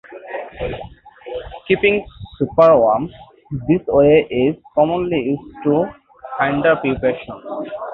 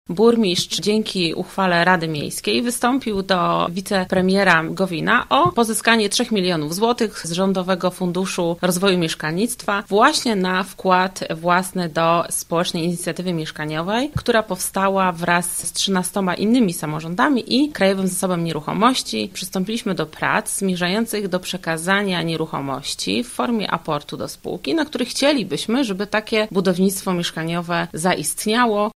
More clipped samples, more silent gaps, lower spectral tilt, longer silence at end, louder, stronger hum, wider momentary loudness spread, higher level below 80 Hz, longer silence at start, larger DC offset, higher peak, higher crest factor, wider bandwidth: neither; neither; first, -9.5 dB/octave vs -4 dB/octave; about the same, 0 s vs 0.05 s; first, -17 LUFS vs -20 LUFS; neither; first, 18 LU vs 8 LU; first, -44 dBFS vs -50 dBFS; about the same, 0.1 s vs 0.1 s; neither; about the same, -2 dBFS vs 0 dBFS; about the same, 16 dB vs 20 dB; second, 5.2 kHz vs 16 kHz